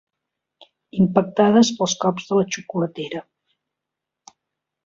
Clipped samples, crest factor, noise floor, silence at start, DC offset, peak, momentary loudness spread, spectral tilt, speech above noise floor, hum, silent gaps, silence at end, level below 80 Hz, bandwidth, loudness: under 0.1%; 20 dB; -84 dBFS; 0.95 s; under 0.1%; -2 dBFS; 15 LU; -5 dB/octave; 65 dB; none; none; 1.65 s; -60 dBFS; 7.8 kHz; -20 LUFS